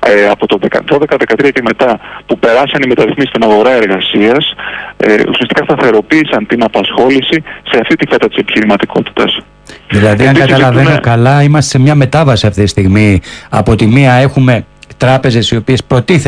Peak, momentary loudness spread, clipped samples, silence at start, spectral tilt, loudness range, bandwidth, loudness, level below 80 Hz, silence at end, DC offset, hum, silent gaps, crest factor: 0 dBFS; 6 LU; 0.2%; 0 s; -6 dB/octave; 2 LU; 10.5 kHz; -9 LUFS; -34 dBFS; 0 s; under 0.1%; none; none; 8 dB